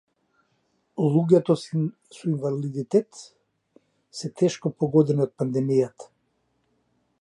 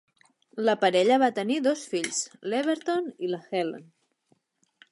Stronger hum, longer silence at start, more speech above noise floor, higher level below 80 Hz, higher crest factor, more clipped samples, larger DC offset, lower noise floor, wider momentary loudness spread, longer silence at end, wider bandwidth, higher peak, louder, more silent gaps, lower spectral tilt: neither; first, 0.95 s vs 0.55 s; first, 48 dB vs 44 dB; first, -72 dBFS vs -82 dBFS; about the same, 20 dB vs 18 dB; neither; neither; about the same, -71 dBFS vs -70 dBFS; first, 15 LU vs 11 LU; about the same, 1.2 s vs 1.1 s; about the same, 11 kHz vs 11.5 kHz; about the same, -6 dBFS vs -8 dBFS; about the same, -24 LUFS vs -26 LUFS; neither; first, -8 dB/octave vs -3.5 dB/octave